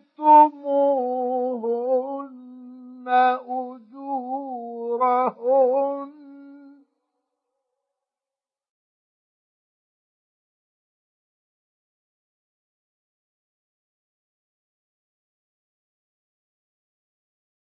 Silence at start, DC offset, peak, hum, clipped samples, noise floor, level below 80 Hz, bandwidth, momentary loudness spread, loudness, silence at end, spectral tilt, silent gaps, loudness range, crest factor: 0.2 s; under 0.1%; -4 dBFS; none; under 0.1%; under -90 dBFS; under -90 dBFS; 5.2 kHz; 22 LU; -21 LUFS; 11.15 s; -8 dB/octave; none; 6 LU; 22 dB